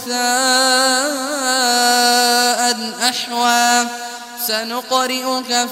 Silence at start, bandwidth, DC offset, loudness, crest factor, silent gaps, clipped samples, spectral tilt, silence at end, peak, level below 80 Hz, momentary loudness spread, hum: 0 s; 16 kHz; under 0.1%; -15 LUFS; 16 dB; none; under 0.1%; 0.5 dB/octave; 0 s; 0 dBFS; -68 dBFS; 8 LU; none